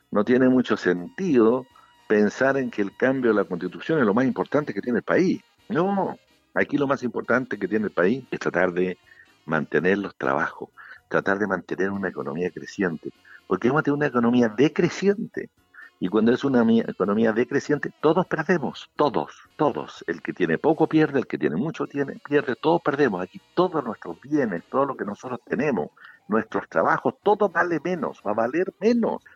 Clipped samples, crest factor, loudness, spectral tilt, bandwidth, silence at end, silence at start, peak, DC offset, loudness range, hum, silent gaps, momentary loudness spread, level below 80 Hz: under 0.1%; 16 dB; -24 LUFS; -7 dB/octave; 7.6 kHz; 0.2 s; 0.1 s; -6 dBFS; under 0.1%; 3 LU; none; none; 10 LU; -64 dBFS